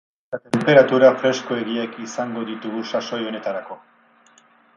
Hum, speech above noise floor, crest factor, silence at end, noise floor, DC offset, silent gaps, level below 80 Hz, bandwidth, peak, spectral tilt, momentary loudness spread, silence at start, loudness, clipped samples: none; 35 dB; 20 dB; 1 s; -55 dBFS; under 0.1%; none; -68 dBFS; 11 kHz; 0 dBFS; -5.5 dB/octave; 18 LU; 0.3 s; -20 LUFS; under 0.1%